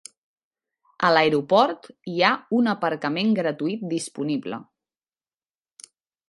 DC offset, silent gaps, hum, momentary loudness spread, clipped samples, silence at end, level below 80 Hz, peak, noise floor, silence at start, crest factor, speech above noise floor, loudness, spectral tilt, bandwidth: under 0.1%; none; none; 11 LU; under 0.1%; 1.65 s; -70 dBFS; -2 dBFS; under -90 dBFS; 1 s; 22 dB; over 68 dB; -22 LUFS; -5 dB/octave; 11.5 kHz